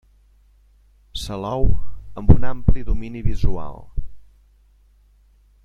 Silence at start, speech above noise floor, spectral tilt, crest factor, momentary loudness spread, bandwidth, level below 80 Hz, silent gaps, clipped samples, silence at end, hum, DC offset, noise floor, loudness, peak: 1.15 s; 40 dB; -7.5 dB/octave; 18 dB; 18 LU; 9.6 kHz; -26 dBFS; none; under 0.1%; 1.45 s; 50 Hz at -40 dBFS; under 0.1%; -54 dBFS; -24 LUFS; 0 dBFS